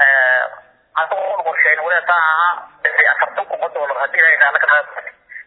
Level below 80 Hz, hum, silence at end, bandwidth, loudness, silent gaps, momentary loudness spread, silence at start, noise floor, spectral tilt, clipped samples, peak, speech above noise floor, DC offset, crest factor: -70 dBFS; none; 0.05 s; 4.1 kHz; -14 LUFS; none; 12 LU; 0 s; -38 dBFS; -3 dB/octave; under 0.1%; 0 dBFS; 23 dB; under 0.1%; 16 dB